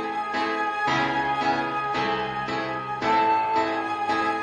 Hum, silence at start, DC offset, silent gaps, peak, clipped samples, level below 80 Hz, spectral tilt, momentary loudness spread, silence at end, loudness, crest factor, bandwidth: none; 0 s; under 0.1%; none; -12 dBFS; under 0.1%; -58 dBFS; -4.5 dB/octave; 6 LU; 0 s; -25 LUFS; 14 dB; 9.8 kHz